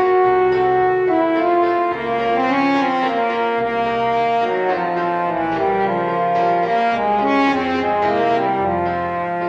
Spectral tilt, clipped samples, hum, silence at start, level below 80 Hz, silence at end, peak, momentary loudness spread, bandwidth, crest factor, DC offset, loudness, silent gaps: -7 dB/octave; under 0.1%; none; 0 s; -52 dBFS; 0 s; -6 dBFS; 4 LU; 7.6 kHz; 12 dB; under 0.1%; -18 LUFS; none